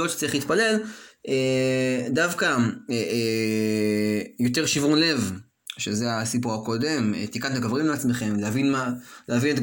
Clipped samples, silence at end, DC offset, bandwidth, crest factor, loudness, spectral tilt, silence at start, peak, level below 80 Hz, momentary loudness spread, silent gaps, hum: under 0.1%; 0 s; under 0.1%; 17 kHz; 16 dB; -24 LUFS; -4.5 dB/octave; 0 s; -8 dBFS; -62 dBFS; 7 LU; none; none